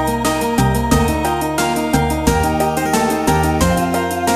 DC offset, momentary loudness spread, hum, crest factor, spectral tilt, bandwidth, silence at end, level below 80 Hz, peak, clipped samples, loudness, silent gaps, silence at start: under 0.1%; 2 LU; none; 16 dB; -5 dB/octave; 15.5 kHz; 0 s; -26 dBFS; 0 dBFS; under 0.1%; -16 LUFS; none; 0 s